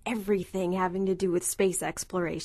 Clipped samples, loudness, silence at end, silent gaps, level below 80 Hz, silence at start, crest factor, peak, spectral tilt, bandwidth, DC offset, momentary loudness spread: under 0.1%; -29 LUFS; 0 s; none; -56 dBFS; 0.05 s; 16 dB; -12 dBFS; -4.5 dB/octave; 13.5 kHz; under 0.1%; 5 LU